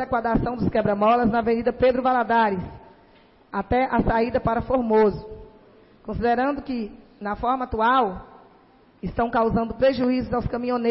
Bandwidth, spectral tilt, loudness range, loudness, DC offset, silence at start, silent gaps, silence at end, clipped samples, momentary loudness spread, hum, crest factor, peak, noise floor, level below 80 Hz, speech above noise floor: 5.8 kHz; -11 dB/octave; 3 LU; -22 LUFS; under 0.1%; 0 s; none; 0 s; under 0.1%; 13 LU; none; 14 dB; -10 dBFS; -55 dBFS; -40 dBFS; 33 dB